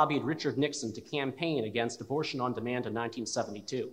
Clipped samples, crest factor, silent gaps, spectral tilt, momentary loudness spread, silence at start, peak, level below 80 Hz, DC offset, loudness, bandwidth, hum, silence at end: under 0.1%; 20 dB; none; -4.5 dB/octave; 5 LU; 0 s; -12 dBFS; -74 dBFS; under 0.1%; -33 LUFS; 15.5 kHz; none; 0 s